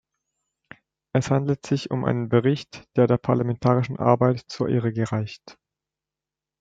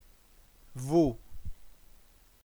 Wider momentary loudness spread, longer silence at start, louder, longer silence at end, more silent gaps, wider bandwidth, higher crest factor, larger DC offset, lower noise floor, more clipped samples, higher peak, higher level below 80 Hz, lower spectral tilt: second, 7 LU vs 23 LU; first, 1.15 s vs 0.7 s; first, -23 LUFS vs -29 LUFS; first, 1.1 s vs 0.8 s; neither; second, 7.8 kHz vs over 20 kHz; about the same, 22 dB vs 20 dB; neither; first, -89 dBFS vs -59 dBFS; neither; first, -2 dBFS vs -14 dBFS; second, -60 dBFS vs -48 dBFS; about the same, -7.5 dB/octave vs -8 dB/octave